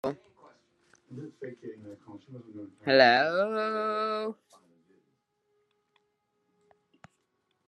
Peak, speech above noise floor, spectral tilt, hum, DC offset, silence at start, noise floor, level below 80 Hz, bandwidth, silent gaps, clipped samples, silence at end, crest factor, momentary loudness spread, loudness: -6 dBFS; 48 dB; -5 dB/octave; none; under 0.1%; 0.05 s; -77 dBFS; -82 dBFS; 10 kHz; none; under 0.1%; 3.35 s; 26 dB; 27 LU; -26 LUFS